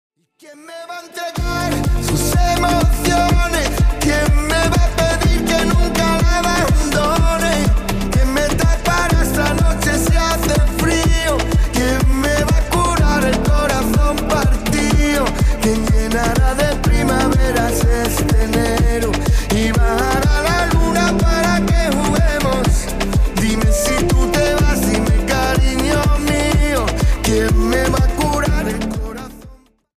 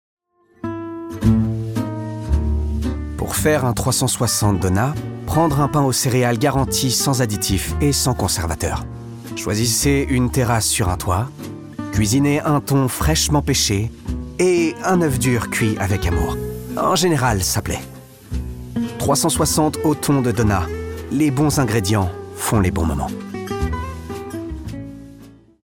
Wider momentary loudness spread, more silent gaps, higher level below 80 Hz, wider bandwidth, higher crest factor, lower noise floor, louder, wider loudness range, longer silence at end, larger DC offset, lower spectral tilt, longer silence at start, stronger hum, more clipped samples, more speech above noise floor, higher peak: second, 3 LU vs 12 LU; neither; first, -18 dBFS vs -32 dBFS; second, 15.5 kHz vs 19 kHz; second, 10 dB vs 16 dB; about the same, -42 dBFS vs -43 dBFS; first, -16 LUFS vs -19 LUFS; about the same, 1 LU vs 3 LU; about the same, 0.4 s vs 0.35 s; neither; about the same, -5 dB/octave vs -4.5 dB/octave; second, 0.5 s vs 0.65 s; neither; neither; second, 20 dB vs 26 dB; about the same, -4 dBFS vs -4 dBFS